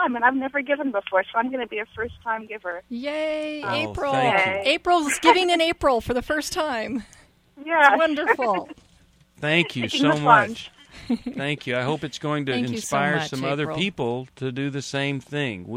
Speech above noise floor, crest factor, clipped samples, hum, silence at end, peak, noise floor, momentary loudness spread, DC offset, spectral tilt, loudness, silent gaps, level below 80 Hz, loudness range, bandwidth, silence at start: 34 dB; 22 dB; under 0.1%; none; 0 s; 0 dBFS; -57 dBFS; 13 LU; under 0.1%; -4.5 dB/octave; -23 LUFS; none; -52 dBFS; 5 LU; 16 kHz; 0 s